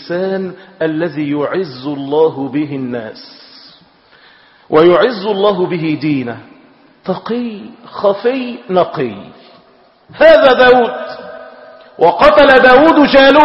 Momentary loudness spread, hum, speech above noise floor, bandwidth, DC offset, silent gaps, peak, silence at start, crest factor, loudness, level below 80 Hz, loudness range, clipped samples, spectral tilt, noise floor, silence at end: 20 LU; none; 36 dB; 7 kHz; under 0.1%; none; 0 dBFS; 0 s; 12 dB; -11 LUFS; -46 dBFS; 10 LU; 0.2%; -7 dB/octave; -47 dBFS; 0 s